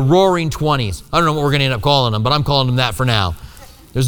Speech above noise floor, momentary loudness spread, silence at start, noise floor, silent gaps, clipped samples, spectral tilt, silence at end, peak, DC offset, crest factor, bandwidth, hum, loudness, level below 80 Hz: 24 dB; 5 LU; 0 s; -39 dBFS; none; under 0.1%; -5.5 dB/octave; 0 s; 0 dBFS; under 0.1%; 16 dB; 20 kHz; none; -16 LUFS; -34 dBFS